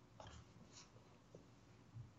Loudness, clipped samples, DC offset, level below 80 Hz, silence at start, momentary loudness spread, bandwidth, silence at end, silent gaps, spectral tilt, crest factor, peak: -63 LUFS; under 0.1%; under 0.1%; -74 dBFS; 0 s; 7 LU; 8 kHz; 0 s; none; -5 dB/octave; 20 dB; -42 dBFS